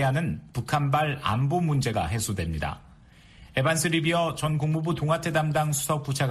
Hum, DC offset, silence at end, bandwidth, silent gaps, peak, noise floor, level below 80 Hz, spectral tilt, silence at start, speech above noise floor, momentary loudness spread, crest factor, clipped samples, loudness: none; under 0.1%; 0 s; 14.5 kHz; none; -10 dBFS; -52 dBFS; -46 dBFS; -5 dB/octave; 0 s; 27 dB; 7 LU; 16 dB; under 0.1%; -26 LUFS